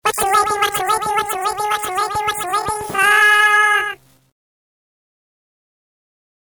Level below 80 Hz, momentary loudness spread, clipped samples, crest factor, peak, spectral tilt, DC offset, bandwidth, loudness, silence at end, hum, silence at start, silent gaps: -52 dBFS; 10 LU; under 0.1%; 14 dB; -4 dBFS; -1 dB/octave; under 0.1%; over 20 kHz; -15 LUFS; 2.45 s; none; 0.05 s; none